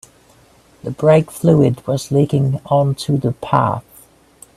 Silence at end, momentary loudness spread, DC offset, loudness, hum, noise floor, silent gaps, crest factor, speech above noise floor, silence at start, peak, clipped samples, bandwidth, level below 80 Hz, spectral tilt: 0.75 s; 8 LU; under 0.1%; -16 LUFS; none; -50 dBFS; none; 16 dB; 35 dB; 0.85 s; 0 dBFS; under 0.1%; 14 kHz; -50 dBFS; -7.5 dB/octave